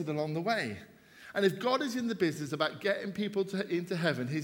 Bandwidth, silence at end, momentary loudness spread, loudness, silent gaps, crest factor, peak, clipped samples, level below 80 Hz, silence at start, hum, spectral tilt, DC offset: 18 kHz; 0 s; 4 LU; -32 LUFS; none; 20 dB; -14 dBFS; under 0.1%; -74 dBFS; 0 s; none; -5.5 dB/octave; under 0.1%